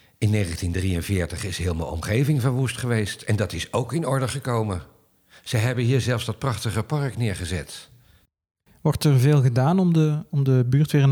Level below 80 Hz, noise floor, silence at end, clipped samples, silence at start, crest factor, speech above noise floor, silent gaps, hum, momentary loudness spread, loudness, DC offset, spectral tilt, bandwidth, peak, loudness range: -48 dBFS; -59 dBFS; 0 s; under 0.1%; 0.2 s; 14 dB; 37 dB; none; none; 9 LU; -23 LUFS; under 0.1%; -6.5 dB/octave; 17 kHz; -8 dBFS; 4 LU